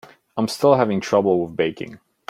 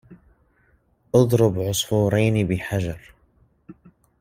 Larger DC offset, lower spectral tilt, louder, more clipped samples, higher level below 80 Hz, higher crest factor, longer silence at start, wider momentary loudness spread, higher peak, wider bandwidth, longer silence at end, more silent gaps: neither; about the same, -6 dB/octave vs -6 dB/octave; about the same, -20 LUFS vs -21 LUFS; neither; second, -62 dBFS vs -50 dBFS; about the same, 18 dB vs 20 dB; first, 0.35 s vs 0.1 s; first, 16 LU vs 9 LU; about the same, -2 dBFS vs -2 dBFS; about the same, 15.5 kHz vs 16 kHz; second, 0.35 s vs 0.5 s; neither